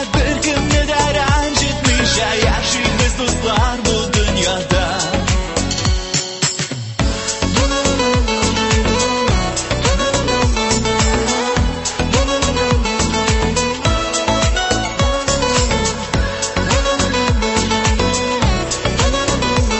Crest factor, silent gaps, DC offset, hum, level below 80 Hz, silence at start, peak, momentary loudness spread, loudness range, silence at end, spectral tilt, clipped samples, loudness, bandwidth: 14 dB; none; under 0.1%; none; -22 dBFS; 0 s; -2 dBFS; 3 LU; 2 LU; 0 s; -3.5 dB/octave; under 0.1%; -16 LUFS; 8.6 kHz